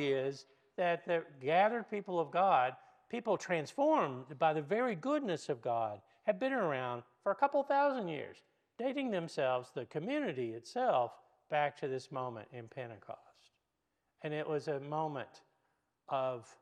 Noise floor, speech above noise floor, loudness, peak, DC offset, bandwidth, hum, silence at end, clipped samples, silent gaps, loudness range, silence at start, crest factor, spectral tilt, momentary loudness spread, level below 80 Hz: -85 dBFS; 49 dB; -36 LUFS; -16 dBFS; under 0.1%; 10 kHz; none; 0.1 s; under 0.1%; none; 9 LU; 0 s; 20 dB; -6 dB/octave; 14 LU; -90 dBFS